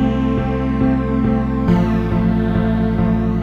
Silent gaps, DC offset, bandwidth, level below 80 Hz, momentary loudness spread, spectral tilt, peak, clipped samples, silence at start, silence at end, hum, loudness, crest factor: none; 0.1%; 6.6 kHz; -26 dBFS; 2 LU; -9.5 dB/octave; -4 dBFS; under 0.1%; 0 s; 0 s; none; -17 LUFS; 12 dB